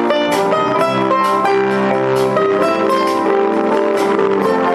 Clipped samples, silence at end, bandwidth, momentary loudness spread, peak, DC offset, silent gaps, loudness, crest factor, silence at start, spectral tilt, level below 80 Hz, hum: under 0.1%; 0 s; 14.5 kHz; 1 LU; 0 dBFS; under 0.1%; none; -14 LUFS; 14 dB; 0 s; -5.5 dB/octave; -56 dBFS; none